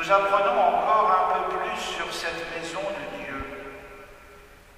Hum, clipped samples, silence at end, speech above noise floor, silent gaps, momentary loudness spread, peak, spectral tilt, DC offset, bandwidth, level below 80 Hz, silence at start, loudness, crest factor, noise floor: none; under 0.1%; 0.25 s; 25 dB; none; 19 LU; -6 dBFS; -3 dB/octave; under 0.1%; 15.5 kHz; -52 dBFS; 0 s; -24 LUFS; 20 dB; -49 dBFS